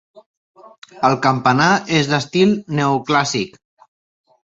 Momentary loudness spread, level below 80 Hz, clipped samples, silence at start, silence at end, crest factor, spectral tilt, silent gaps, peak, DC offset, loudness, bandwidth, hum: 5 LU; -58 dBFS; under 0.1%; 0.95 s; 1.05 s; 18 dB; -5 dB/octave; none; 0 dBFS; under 0.1%; -16 LUFS; 8 kHz; none